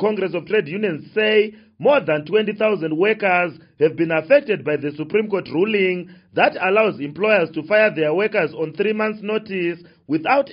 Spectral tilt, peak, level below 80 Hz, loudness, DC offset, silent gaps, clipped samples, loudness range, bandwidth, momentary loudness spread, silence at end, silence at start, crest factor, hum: -3.5 dB/octave; -2 dBFS; -66 dBFS; -19 LUFS; under 0.1%; none; under 0.1%; 1 LU; 5.4 kHz; 8 LU; 0 s; 0 s; 18 dB; none